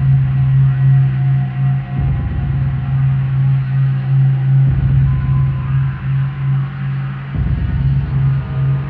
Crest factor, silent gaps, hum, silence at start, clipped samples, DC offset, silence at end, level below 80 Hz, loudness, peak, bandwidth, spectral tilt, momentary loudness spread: 10 dB; none; none; 0 s; under 0.1%; under 0.1%; 0 s; -26 dBFS; -15 LUFS; -4 dBFS; 3.5 kHz; -11.5 dB/octave; 6 LU